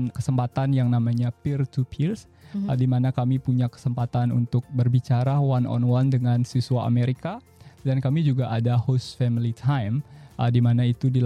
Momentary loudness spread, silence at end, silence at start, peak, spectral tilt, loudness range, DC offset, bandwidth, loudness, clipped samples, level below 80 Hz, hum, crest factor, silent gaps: 6 LU; 0 s; 0 s; -10 dBFS; -8.5 dB/octave; 2 LU; under 0.1%; 9.2 kHz; -24 LUFS; under 0.1%; -56 dBFS; none; 14 dB; none